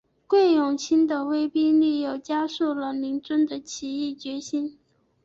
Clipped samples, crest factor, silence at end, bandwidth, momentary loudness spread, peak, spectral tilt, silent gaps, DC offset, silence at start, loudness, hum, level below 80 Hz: under 0.1%; 14 dB; 0.55 s; 7.8 kHz; 10 LU; -10 dBFS; -3.5 dB/octave; none; under 0.1%; 0.3 s; -24 LUFS; none; -68 dBFS